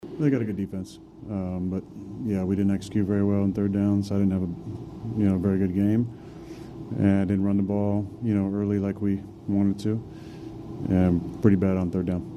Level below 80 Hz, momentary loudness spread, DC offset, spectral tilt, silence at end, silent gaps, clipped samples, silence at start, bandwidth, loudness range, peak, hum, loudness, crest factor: -52 dBFS; 16 LU; under 0.1%; -9 dB/octave; 0 s; none; under 0.1%; 0 s; 9.4 kHz; 2 LU; -4 dBFS; none; -25 LUFS; 20 dB